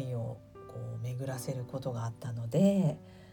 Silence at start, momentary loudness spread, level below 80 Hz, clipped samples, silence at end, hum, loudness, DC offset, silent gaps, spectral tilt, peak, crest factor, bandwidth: 0 s; 17 LU; -64 dBFS; under 0.1%; 0 s; none; -34 LUFS; under 0.1%; none; -7.5 dB/octave; -14 dBFS; 18 dB; 18 kHz